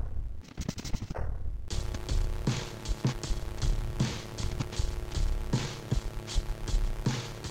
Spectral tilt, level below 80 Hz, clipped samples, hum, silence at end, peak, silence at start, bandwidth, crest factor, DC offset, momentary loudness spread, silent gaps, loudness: -5 dB/octave; -34 dBFS; under 0.1%; none; 0 s; -16 dBFS; 0 s; 16 kHz; 16 dB; under 0.1%; 6 LU; none; -35 LUFS